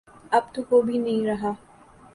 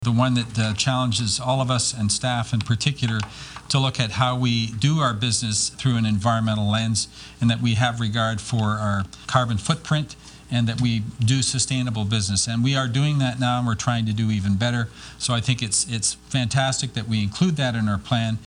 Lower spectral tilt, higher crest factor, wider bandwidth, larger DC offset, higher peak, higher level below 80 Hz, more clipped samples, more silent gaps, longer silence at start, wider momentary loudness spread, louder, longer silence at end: first, -6.5 dB/octave vs -4.5 dB/octave; about the same, 18 dB vs 20 dB; about the same, 11.5 kHz vs 10.5 kHz; neither; second, -8 dBFS vs -4 dBFS; second, -60 dBFS vs -48 dBFS; neither; neither; first, 0.3 s vs 0 s; first, 9 LU vs 5 LU; about the same, -24 LUFS vs -22 LUFS; first, 0.6 s vs 0.05 s